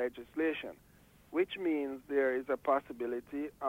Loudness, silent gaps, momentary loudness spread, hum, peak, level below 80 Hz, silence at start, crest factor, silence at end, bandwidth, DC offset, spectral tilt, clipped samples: -35 LUFS; none; 7 LU; none; -18 dBFS; -70 dBFS; 0 s; 16 dB; 0 s; 16 kHz; under 0.1%; -6 dB/octave; under 0.1%